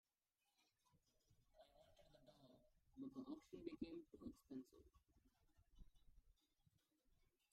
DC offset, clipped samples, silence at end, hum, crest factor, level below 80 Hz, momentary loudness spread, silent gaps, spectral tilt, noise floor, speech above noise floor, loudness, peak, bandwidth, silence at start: under 0.1%; under 0.1%; 0.3 s; none; 24 dB; -78 dBFS; 6 LU; none; -6.5 dB/octave; under -90 dBFS; over 32 dB; -58 LUFS; -38 dBFS; 11.5 kHz; 0.6 s